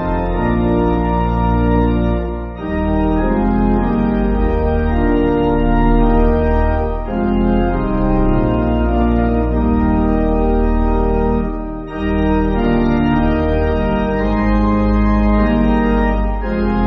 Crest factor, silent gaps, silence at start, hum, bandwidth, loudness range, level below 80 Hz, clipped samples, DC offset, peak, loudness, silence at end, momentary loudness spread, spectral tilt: 12 dB; none; 0 s; none; 5 kHz; 1 LU; -18 dBFS; under 0.1%; under 0.1%; -2 dBFS; -16 LUFS; 0 s; 5 LU; -7.5 dB/octave